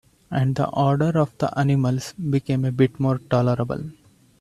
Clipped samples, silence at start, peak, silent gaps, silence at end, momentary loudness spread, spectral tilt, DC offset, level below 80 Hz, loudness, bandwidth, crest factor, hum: under 0.1%; 0.3 s; -4 dBFS; none; 0.5 s; 7 LU; -8 dB/octave; under 0.1%; -54 dBFS; -22 LUFS; 12 kHz; 18 dB; none